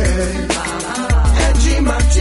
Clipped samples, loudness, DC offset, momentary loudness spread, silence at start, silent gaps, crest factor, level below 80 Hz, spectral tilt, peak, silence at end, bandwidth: under 0.1%; -16 LUFS; under 0.1%; 6 LU; 0 s; none; 12 dB; -16 dBFS; -4.5 dB/octave; -2 dBFS; 0 s; 11.5 kHz